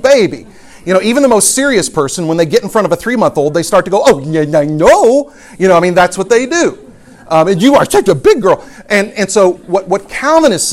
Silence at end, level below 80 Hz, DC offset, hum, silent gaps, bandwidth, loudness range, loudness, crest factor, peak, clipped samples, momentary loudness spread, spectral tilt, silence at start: 0 s; -42 dBFS; under 0.1%; none; none; 16 kHz; 1 LU; -10 LUFS; 10 dB; 0 dBFS; 0.4%; 6 LU; -4 dB/octave; 0 s